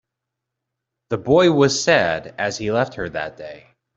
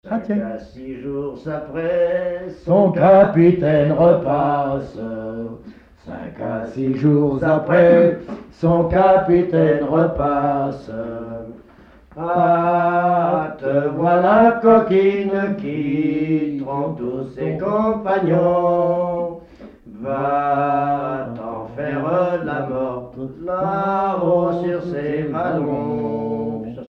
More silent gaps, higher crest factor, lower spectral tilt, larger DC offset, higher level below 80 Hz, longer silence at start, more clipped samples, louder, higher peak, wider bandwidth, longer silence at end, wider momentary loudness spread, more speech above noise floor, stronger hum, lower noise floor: neither; about the same, 18 dB vs 16 dB; second, -4.5 dB/octave vs -10 dB/octave; neither; second, -52 dBFS vs -46 dBFS; first, 1.1 s vs 0.05 s; neither; about the same, -19 LUFS vs -18 LUFS; about the same, -2 dBFS vs -2 dBFS; first, 8.2 kHz vs 6 kHz; first, 0.35 s vs 0.05 s; about the same, 14 LU vs 16 LU; first, 63 dB vs 29 dB; neither; first, -82 dBFS vs -47 dBFS